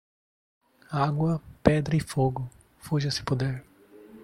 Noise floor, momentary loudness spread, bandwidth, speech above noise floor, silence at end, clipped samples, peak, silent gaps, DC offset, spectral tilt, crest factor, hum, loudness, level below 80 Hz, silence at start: -51 dBFS; 13 LU; 14 kHz; 25 dB; 0 s; under 0.1%; -4 dBFS; none; under 0.1%; -6.5 dB/octave; 26 dB; none; -27 LUFS; -50 dBFS; 0.9 s